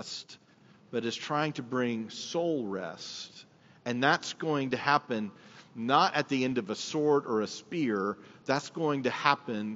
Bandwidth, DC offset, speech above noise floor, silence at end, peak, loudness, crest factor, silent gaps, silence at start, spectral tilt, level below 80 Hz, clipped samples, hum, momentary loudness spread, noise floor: 8 kHz; under 0.1%; 29 dB; 0 s; -6 dBFS; -31 LUFS; 24 dB; none; 0 s; -3.5 dB/octave; -80 dBFS; under 0.1%; none; 13 LU; -59 dBFS